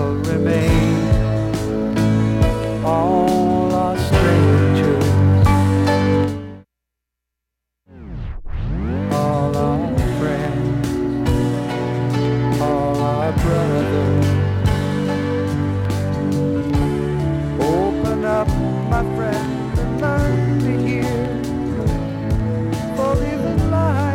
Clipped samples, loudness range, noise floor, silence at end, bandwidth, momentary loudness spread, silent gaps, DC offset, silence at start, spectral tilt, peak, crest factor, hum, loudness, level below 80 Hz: under 0.1%; 6 LU; -81 dBFS; 0 s; 15.5 kHz; 7 LU; none; under 0.1%; 0 s; -7.5 dB/octave; -2 dBFS; 16 dB; none; -18 LUFS; -30 dBFS